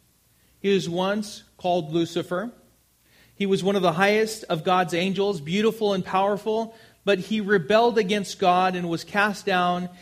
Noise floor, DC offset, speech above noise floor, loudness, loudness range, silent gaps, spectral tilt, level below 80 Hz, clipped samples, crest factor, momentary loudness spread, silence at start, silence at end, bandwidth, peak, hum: -62 dBFS; under 0.1%; 38 dB; -23 LUFS; 4 LU; none; -5 dB/octave; -64 dBFS; under 0.1%; 20 dB; 9 LU; 0.65 s; 0.05 s; 15.5 kHz; -4 dBFS; none